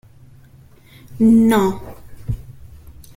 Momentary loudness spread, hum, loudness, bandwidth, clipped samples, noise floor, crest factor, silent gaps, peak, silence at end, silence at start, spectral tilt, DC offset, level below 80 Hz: 21 LU; none; -16 LUFS; 16 kHz; under 0.1%; -46 dBFS; 16 dB; none; -4 dBFS; 0.65 s; 1.1 s; -7 dB/octave; under 0.1%; -40 dBFS